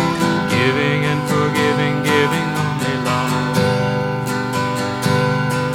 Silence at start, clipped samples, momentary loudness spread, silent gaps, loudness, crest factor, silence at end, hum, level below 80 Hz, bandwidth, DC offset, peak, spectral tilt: 0 s; under 0.1%; 4 LU; none; -18 LUFS; 16 dB; 0 s; 50 Hz at -35 dBFS; -48 dBFS; 17 kHz; under 0.1%; -2 dBFS; -5.5 dB/octave